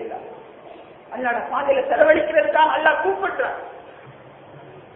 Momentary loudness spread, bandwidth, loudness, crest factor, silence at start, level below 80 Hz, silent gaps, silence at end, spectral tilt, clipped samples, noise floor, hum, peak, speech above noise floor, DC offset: 22 LU; 3.8 kHz; -19 LUFS; 20 dB; 0 s; -58 dBFS; none; 0.15 s; -8.5 dB/octave; under 0.1%; -43 dBFS; none; -2 dBFS; 24 dB; under 0.1%